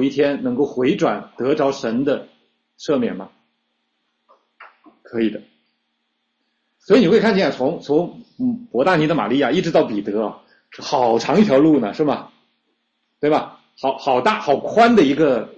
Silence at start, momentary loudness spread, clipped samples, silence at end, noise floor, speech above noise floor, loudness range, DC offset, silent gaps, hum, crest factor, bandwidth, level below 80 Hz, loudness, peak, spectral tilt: 0 s; 12 LU; under 0.1%; 0.05 s; -71 dBFS; 54 dB; 10 LU; under 0.1%; none; none; 16 dB; 8.4 kHz; -58 dBFS; -18 LUFS; -2 dBFS; -6.5 dB/octave